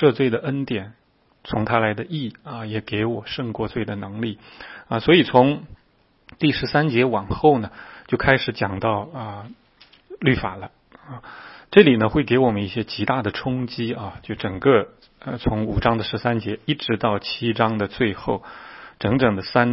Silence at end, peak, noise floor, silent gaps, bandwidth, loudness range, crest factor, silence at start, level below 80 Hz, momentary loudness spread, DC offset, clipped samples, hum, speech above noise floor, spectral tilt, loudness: 0 s; 0 dBFS; -60 dBFS; none; 5.8 kHz; 6 LU; 22 dB; 0 s; -44 dBFS; 19 LU; under 0.1%; under 0.1%; none; 39 dB; -10 dB/octave; -21 LUFS